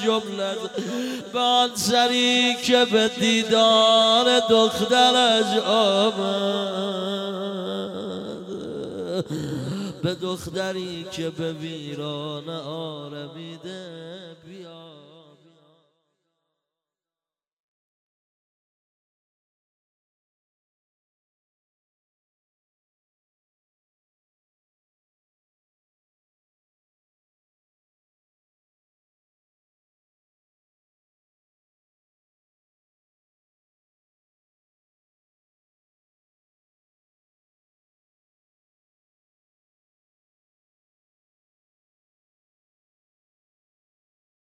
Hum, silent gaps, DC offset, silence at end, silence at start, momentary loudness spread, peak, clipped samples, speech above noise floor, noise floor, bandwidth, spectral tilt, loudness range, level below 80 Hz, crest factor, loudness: none; none; under 0.1%; 29.45 s; 0 s; 20 LU; -4 dBFS; under 0.1%; over 68 dB; under -90 dBFS; 16 kHz; -3.5 dB/octave; 18 LU; -68 dBFS; 22 dB; -21 LUFS